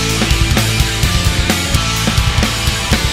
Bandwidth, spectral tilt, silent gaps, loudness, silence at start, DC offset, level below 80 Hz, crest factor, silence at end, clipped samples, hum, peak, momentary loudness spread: 16.5 kHz; -3.5 dB/octave; none; -14 LUFS; 0 s; under 0.1%; -20 dBFS; 14 dB; 0 s; under 0.1%; none; 0 dBFS; 1 LU